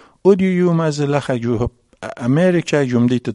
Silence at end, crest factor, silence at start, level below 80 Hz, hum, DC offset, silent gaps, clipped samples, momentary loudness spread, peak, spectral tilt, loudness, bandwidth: 0 s; 16 dB; 0.25 s; -42 dBFS; none; under 0.1%; none; under 0.1%; 10 LU; 0 dBFS; -7 dB/octave; -17 LUFS; 11 kHz